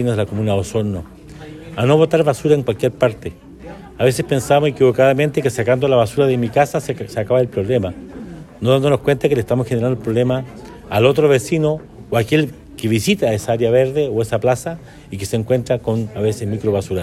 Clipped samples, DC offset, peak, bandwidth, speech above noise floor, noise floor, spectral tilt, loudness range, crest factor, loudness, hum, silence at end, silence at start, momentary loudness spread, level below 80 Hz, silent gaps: under 0.1%; under 0.1%; 0 dBFS; 15 kHz; 19 dB; -36 dBFS; -6.5 dB/octave; 3 LU; 16 dB; -17 LUFS; none; 0 s; 0 s; 18 LU; -44 dBFS; none